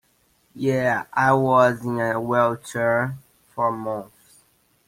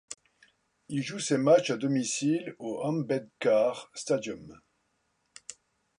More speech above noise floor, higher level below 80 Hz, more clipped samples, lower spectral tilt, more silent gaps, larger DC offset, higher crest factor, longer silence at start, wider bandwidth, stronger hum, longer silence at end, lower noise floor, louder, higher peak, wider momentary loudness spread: second, 42 dB vs 47 dB; first, -60 dBFS vs -74 dBFS; neither; first, -6.5 dB/octave vs -5 dB/octave; neither; neither; about the same, 20 dB vs 20 dB; first, 0.55 s vs 0.1 s; first, 16.5 kHz vs 11 kHz; neither; first, 0.85 s vs 0.5 s; second, -63 dBFS vs -75 dBFS; first, -22 LUFS vs -29 LUFS; first, -4 dBFS vs -10 dBFS; second, 13 LU vs 22 LU